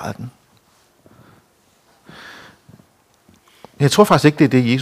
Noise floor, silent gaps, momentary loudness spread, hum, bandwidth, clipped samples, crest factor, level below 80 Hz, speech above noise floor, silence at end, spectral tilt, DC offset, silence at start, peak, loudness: -57 dBFS; none; 26 LU; none; 16 kHz; under 0.1%; 20 dB; -58 dBFS; 43 dB; 0 s; -6 dB/octave; under 0.1%; 0 s; 0 dBFS; -14 LUFS